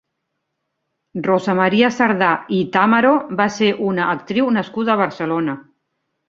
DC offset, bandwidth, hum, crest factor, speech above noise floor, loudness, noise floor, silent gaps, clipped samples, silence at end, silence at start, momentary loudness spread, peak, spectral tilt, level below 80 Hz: under 0.1%; 7.6 kHz; none; 18 dB; 58 dB; -17 LUFS; -75 dBFS; none; under 0.1%; 0.7 s; 1.15 s; 7 LU; 0 dBFS; -6 dB/octave; -62 dBFS